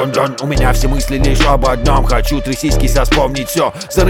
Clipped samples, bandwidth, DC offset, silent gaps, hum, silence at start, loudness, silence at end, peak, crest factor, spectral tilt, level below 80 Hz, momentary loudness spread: under 0.1%; 16.5 kHz; under 0.1%; none; none; 0 s; -14 LUFS; 0 s; 0 dBFS; 12 dB; -5 dB/octave; -16 dBFS; 4 LU